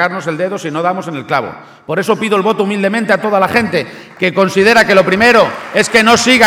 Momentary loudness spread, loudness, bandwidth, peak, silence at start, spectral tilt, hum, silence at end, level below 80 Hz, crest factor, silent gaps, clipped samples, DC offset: 10 LU; -12 LUFS; 19 kHz; 0 dBFS; 0 s; -4 dB/octave; none; 0 s; -48 dBFS; 12 dB; none; 0.3%; under 0.1%